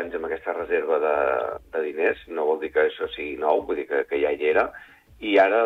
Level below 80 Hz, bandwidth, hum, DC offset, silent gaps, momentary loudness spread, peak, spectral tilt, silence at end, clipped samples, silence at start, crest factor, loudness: -56 dBFS; 5.2 kHz; none; under 0.1%; none; 8 LU; -8 dBFS; -5.5 dB/octave; 0 s; under 0.1%; 0 s; 16 dB; -24 LUFS